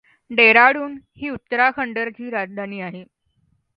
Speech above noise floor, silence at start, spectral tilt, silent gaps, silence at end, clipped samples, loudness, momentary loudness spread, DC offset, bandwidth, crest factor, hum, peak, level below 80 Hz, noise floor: 46 dB; 0.3 s; -7 dB/octave; none; 0.75 s; under 0.1%; -17 LUFS; 20 LU; under 0.1%; 5.6 kHz; 20 dB; none; 0 dBFS; -62 dBFS; -65 dBFS